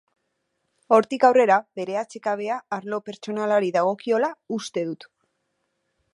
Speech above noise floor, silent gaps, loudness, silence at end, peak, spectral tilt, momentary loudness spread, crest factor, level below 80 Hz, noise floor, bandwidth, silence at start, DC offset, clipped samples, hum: 53 dB; none; -23 LUFS; 1.2 s; -4 dBFS; -5 dB/octave; 14 LU; 20 dB; -80 dBFS; -75 dBFS; 11.5 kHz; 0.9 s; under 0.1%; under 0.1%; none